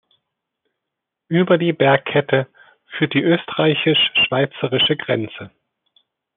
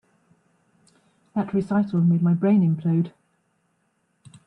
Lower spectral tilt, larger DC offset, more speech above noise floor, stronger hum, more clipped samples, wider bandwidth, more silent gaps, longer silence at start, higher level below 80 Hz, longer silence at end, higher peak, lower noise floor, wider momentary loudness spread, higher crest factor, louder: second, -3 dB/octave vs -10.5 dB/octave; neither; first, 64 dB vs 49 dB; neither; neither; about the same, 4.2 kHz vs 4.2 kHz; neither; about the same, 1.3 s vs 1.35 s; about the same, -64 dBFS vs -68 dBFS; second, 0.9 s vs 1.35 s; first, -2 dBFS vs -10 dBFS; first, -82 dBFS vs -70 dBFS; about the same, 8 LU vs 10 LU; about the same, 18 dB vs 14 dB; first, -17 LUFS vs -22 LUFS